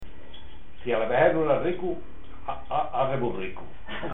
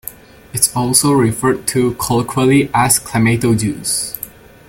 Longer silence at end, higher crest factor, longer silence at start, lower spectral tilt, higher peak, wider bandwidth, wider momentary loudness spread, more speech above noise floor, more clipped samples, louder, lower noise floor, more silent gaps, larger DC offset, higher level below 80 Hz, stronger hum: second, 0 s vs 0.4 s; first, 22 dB vs 16 dB; about the same, 0 s vs 0.05 s; first, -9.5 dB/octave vs -4.5 dB/octave; second, -8 dBFS vs 0 dBFS; second, 4 kHz vs 17 kHz; first, 24 LU vs 12 LU; about the same, 21 dB vs 21 dB; neither; second, -27 LUFS vs -14 LUFS; first, -47 dBFS vs -35 dBFS; neither; first, 3% vs under 0.1%; second, -50 dBFS vs -42 dBFS; neither